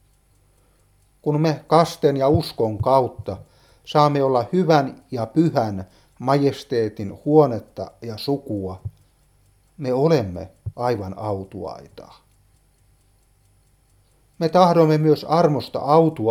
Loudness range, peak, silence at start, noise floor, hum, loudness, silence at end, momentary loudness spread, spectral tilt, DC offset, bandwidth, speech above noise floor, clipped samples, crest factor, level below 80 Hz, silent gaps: 10 LU; 0 dBFS; 1.25 s; -59 dBFS; none; -20 LUFS; 0 s; 16 LU; -7.5 dB/octave; under 0.1%; 15 kHz; 39 dB; under 0.1%; 20 dB; -52 dBFS; none